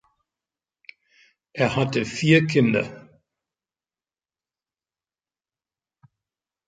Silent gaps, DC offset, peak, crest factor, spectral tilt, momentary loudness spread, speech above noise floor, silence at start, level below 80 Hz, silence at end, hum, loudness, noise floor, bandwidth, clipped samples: none; under 0.1%; -4 dBFS; 24 dB; -6 dB/octave; 12 LU; over 70 dB; 1.55 s; -62 dBFS; 3.65 s; none; -21 LUFS; under -90 dBFS; 9.2 kHz; under 0.1%